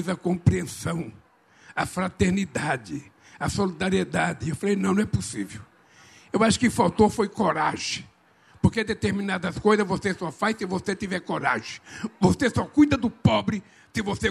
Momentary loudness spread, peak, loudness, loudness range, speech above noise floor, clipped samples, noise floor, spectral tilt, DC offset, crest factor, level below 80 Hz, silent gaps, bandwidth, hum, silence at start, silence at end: 12 LU; -6 dBFS; -25 LUFS; 3 LU; 32 dB; under 0.1%; -57 dBFS; -5.5 dB/octave; under 0.1%; 20 dB; -48 dBFS; none; 13 kHz; none; 0 s; 0 s